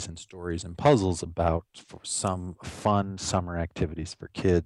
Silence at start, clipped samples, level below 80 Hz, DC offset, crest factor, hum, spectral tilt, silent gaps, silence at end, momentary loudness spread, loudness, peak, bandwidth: 0 s; under 0.1%; -44 dBFS; under 0.1%; 20 dB; none; -5.5 dB/octave; none; 0 s; 15 LU; -28 LUFS; -8 dBFS; 12 kHz